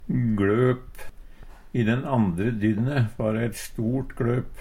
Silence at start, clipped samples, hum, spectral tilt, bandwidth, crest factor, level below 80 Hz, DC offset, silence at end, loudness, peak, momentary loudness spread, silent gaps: 0 s; under 0.1%; none; -7.5 dB/octave; 15.5 kHz; 16 dB; -42 dBFS; under 0.1%; 0 s; -25 LUFS; -10 dBFS; 8 LU; none